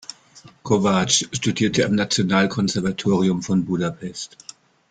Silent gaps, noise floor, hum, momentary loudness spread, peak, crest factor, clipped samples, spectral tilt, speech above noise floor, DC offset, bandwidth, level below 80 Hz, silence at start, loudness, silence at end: none; -49 dBFS; none; 15 LU; -4 dBFS; 18 dB; under 0.1%; -4.5 dB/octave; 28 dB; under 0.1%; 9.4 kHz; -54 dBFS; 0.1 s; -20 LUFS; 0.65 s